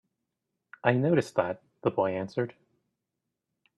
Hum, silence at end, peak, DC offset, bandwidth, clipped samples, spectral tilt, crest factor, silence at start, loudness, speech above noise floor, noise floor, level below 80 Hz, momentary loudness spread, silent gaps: none; 1.25 s; -8 dBFS; under 0.1%; 12 kHz; under 0.1%; -7.5 dB/octave; 24 dB; 0.85 s; -29 LUFS; 58 dB; -85 dBFS; -70 dBFS; 9 LU; none